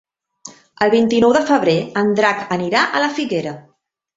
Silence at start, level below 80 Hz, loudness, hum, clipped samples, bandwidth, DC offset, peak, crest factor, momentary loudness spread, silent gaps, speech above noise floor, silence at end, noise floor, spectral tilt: 0.45 s; -56 dBFS; -16 LUFS; none; under 0.1%; 8 kHz; under 0.1%; -2 dBFS; 16 dB; 9 LU; none; 26 dB; 0.55 s; -42 dBFS; -5 dB/octave